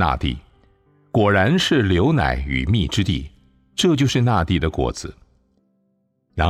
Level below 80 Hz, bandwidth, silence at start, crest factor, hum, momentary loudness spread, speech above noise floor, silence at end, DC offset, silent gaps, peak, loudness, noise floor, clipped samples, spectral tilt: -34 dBFS; 14 kHz; 0 s; 16 dB; none; 15 LU; 48 dB; 0 s; under 0.1%; none; -4 dBFS; -19 LUFS; -67 dBFS; under 0.1%; -5.5 dB/octave